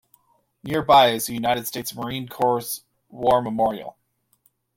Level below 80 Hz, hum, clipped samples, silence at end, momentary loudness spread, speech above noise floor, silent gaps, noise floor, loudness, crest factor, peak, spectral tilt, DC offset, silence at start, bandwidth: -58 dBFS; none; under 0.1%; 0.85 s; 17 LU; 44 dB; none; -65 dBFS; -22 LUFS; 20 dB; -4 dBFS; -4 dB/octave; under 0.1%; 0.65 s; 16.5 kHz